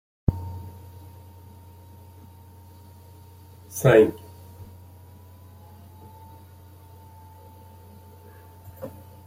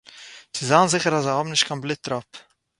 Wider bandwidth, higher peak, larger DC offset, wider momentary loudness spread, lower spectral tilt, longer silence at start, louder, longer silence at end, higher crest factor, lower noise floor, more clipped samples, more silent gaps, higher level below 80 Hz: first, 16.5 kHz vs 11.5 kHz; about the same, -4 dBFS vs -2 dBFS; neither; first, 25 LU vs 15 LU; first, -6.5 dB/octave vs -3.5 dB/octave; first, 0.3 s vs 0.15 s; about the same, -22 LUFS vs -21 LUFS; about the same, 0.35 s vs 0.4 s; about the same, 26 dB vs 22 dB; about the same, -48 dBFS vs -45 dBFS; neither; neither; first, -48 dBFS vs -64 dBFS